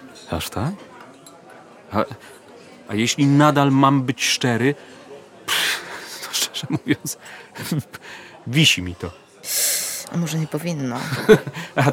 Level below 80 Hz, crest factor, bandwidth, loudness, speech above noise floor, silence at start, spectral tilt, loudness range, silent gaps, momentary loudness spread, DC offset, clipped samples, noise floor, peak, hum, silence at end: -54 dBFS; 20 dB; 19.5 kHz; -20 LUFS; 24 dB; 0 s; -4 dB/octave; 6 LU; none; 19 LU; under 0.1%; under 0.1%; -44 dBFS; -2 dBFS; none; 0 s